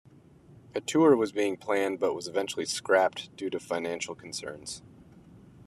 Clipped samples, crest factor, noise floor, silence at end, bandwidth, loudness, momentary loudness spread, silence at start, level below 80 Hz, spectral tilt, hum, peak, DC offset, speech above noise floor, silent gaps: under 0.1%; 20 dB; -55 dBFS; 0.05 s; 13.5 kHz; -29 LUFS; 15 LU; 0.5 s; -70 dBFS; -4 dB/octave; none; -10 dBFS; under 0.1%; 27 dB; none